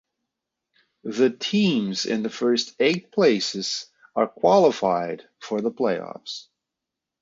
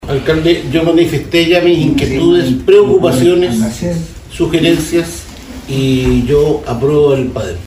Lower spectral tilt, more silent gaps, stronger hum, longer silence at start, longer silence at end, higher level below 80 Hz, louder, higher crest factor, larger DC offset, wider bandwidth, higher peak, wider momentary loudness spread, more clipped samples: second, -4.5 dB/octave vs -6 dB/octave; neither; neither; first, 1.05 s vs 0 s; first, 0.8 s vs 0 s; second, -70 dBFS vs -30 dBFS; second, -23 LUFS vs -11 LUFS; first, 20 dB vs 12 dB; neither; second, 7.8 kHz vs 16 kHz; second, -4 dBFS vs 0 dBFS; first, 14 LU vs 10 LU; neither